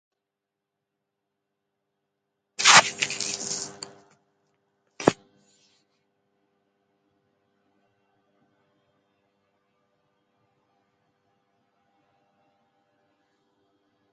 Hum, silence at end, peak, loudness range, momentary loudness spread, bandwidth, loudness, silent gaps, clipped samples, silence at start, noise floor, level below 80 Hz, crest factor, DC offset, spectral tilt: none; 9 s; 0 dBFS; 11 LU; 28 LU; 9.4 kHz; -20 LUFS; none; under 0.1%; 2.6 s; -85 dBFS; -74 dBFS; 32 dB; under 0.1%; -1 dB/octave